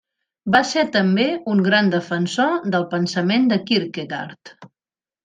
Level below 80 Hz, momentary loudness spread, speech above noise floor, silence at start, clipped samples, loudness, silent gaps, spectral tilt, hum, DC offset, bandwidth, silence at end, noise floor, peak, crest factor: -64 dBFS; 11 LU; over 71 dB; 0.45 s; under 0.1%; -19 LUFS; none; -5.5 dB/octave; none; under 0.1%; 9.4 kHz; 0.55 s; under -90 dBFS; -2 dBFS; 18 dB